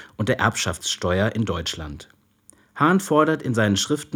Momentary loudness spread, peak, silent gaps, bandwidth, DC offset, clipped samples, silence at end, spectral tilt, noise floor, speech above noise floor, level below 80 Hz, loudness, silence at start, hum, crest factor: 13 LU; -2 dBFS; none; 18 kHz; under 0.1%; under 0.1%; 0 s; -4.5 dB/octave; -56 dBFS; 34 dB; -50 dBFS; -21 LUFS; 0 s; none; 20 dB